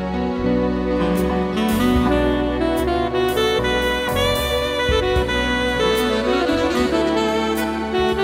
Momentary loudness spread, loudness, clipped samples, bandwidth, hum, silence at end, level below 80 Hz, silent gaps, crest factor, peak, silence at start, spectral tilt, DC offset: 2 LU; -19 LUFS; under 0.1%; 16 kHz; none; 0 s; -30 dBFS; none; 14 dB; -6 dBFS; 0 s; -5 dB/octave; under 0.1%